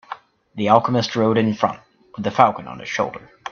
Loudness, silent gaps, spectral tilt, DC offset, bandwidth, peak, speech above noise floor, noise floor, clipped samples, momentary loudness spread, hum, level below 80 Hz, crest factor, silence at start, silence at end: -19 LUFS; none; -6 dB/octave; under 0.1%; 7 kHz; 0 dBFS; 19 dB; -38 dBFS; under 0.1%; 21 LU; none; -60 dBFS; 20 dB; 0.1 s; 0 s